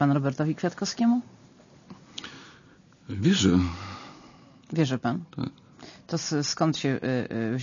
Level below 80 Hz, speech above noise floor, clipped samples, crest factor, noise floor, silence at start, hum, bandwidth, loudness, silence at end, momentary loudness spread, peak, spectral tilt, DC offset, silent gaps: -56 dBFS; 29 dB; under 0.1%; 18 dB; -55 dBFS; 0 s; none; 7.4 kHz; -27 LUFS; 0 s; 20 LU; -10 dBFS; -5.5 dB/octave; under 0.1%; none